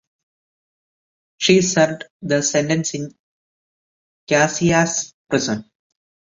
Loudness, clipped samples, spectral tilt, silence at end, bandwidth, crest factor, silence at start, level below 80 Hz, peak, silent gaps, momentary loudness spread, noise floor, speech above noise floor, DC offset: -18 LUFS; under 0.1%; -4 dB/octave; 0.6 s; 8 kHz; 20 dB; 1.4 s; -56 dBFS; -2 dBFS; 2.10-2.20 s, 3.19-4.27 s, 5.14-5.25 s; 12 LU; under -90 dBFS; over 72 dB; under 0.1%